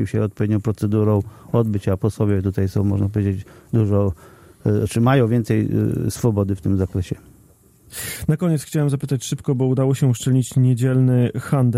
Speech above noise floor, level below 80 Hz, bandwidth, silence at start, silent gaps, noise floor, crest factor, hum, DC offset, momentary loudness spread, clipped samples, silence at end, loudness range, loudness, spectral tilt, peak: 33 dB; -46 dBFS; 15.5 kHz; 0 s; none; -52 dBFS; 14 dB; none; under 0.1%; 7 LU; under 0.1%; 0 s; 3 LU; -20 LUFS; -7.5 dB/octave; -6 dBFS